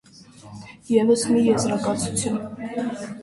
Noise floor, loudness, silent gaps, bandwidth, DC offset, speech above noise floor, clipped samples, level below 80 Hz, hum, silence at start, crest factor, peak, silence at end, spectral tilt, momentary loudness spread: -46 dBFS; -22 LUFS; none; 11.5 kHz; under 0.1%; 24 dB; under 0.1%; -56 dBFS; none; 0.45 s; 18 dB; -6 dBFS; 0 s; -5 dB/octave; 22 LU